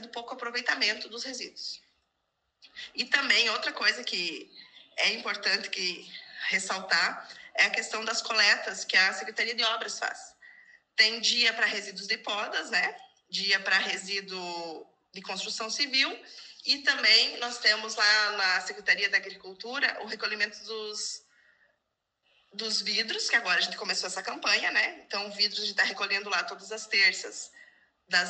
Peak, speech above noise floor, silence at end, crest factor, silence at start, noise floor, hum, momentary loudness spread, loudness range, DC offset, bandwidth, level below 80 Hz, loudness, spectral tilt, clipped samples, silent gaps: -8 dBFS; 52 dB; 0 s; 22 dB; 0 s; -81 dBFS; none; 16 LU; 6 LU; under 0.1%; 9.4 kHz; -82 dBFS; -27 LUFS; 0 dB/octave; under 0.1%; none